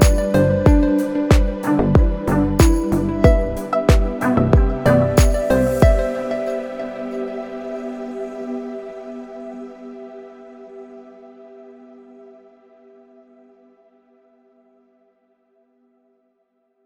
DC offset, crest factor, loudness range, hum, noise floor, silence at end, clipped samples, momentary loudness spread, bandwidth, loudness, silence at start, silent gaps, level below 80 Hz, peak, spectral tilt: under 0.1%; 18 dB; 20 LU; none; -67 dBFS; 5.15 s; under 0.1%; 21 LU; 19 kHz; -18 LUFS; 0 s; none; -24 dBFS; 0 dBFS; -7 dB/octave